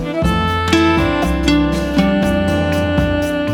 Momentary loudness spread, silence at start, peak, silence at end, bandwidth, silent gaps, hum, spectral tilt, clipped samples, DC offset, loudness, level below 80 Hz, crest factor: 3 LU; 0 s; 0 dBFS; 0 s; 18.5 kHz; none; none; -6 dB/octave; under 0.1%; under 0.1%; -15 LUFS; -26 dBFS; 14 dB